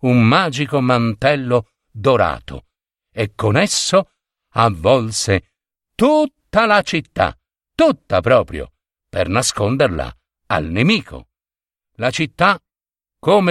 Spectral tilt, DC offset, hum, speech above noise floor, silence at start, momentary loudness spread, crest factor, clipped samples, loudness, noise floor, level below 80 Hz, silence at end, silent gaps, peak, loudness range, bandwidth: -5 dB/octave; under 0.1%; none; over 74 dB; 0 s; 14 LU; 16 dB; under 0.1%; -17 LUFS; under -90 dBFS; -42 dBFS; 0 s; none; 0 dBFS; 3 LU; 14 kHz